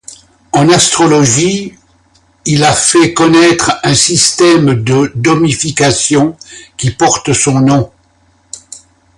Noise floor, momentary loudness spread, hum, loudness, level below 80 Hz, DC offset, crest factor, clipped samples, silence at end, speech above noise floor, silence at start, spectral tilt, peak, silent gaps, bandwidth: -51 dBFS; 15 LU; none; -9 LUFS; -40 dBFS; under 0.1%; 10 dB; under 0.1%; 0.4 s; 42 dB; 0.1 s; -4 dB/octave; 0 dBFS; none; 11.5 kHz